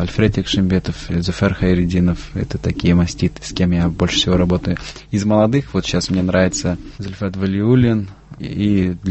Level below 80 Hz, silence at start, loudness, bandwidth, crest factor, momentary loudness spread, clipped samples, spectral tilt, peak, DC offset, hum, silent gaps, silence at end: -30 dBFS; 0 s; -18 LUFS; 8.4 kHz; 16 dB; 9 LU; under 0.1%; -6 dB/octave; -2 dBFS; under 0.1%; none; none; 0 s